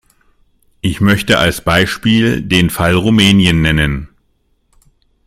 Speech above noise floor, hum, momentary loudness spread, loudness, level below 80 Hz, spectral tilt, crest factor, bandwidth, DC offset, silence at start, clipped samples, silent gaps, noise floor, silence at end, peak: 48 dB; none; 7 LU; -12 LUFS; -32 dBFS; -5 dB/octave; 14 dB; 16.5 kHz; under 0.1%; 0.85 s; under 0.1%; none; -59 dBFS; 1.2 s; 0 dBFS